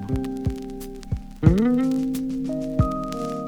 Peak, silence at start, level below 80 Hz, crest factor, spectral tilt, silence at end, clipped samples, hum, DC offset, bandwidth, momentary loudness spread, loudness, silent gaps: -2 dBFS; 0 s; -34 dBFS; 22 dB; -8.5 dB/octave; 0 s; under 0.1%; none; under 0.1%; 19 kHz; 13 LU; -24 LUFS; none